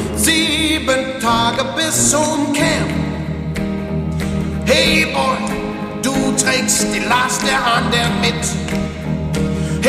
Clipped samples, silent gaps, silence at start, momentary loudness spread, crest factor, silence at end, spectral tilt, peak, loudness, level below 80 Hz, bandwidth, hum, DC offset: under 0.1%; none; 0 s; 9 LU; 16 dB; 0 s; -3.5 dB/octave; 0 dBFS; -16 LUFS; -32 dBFS; 15.5 kHz; none; under 0.1%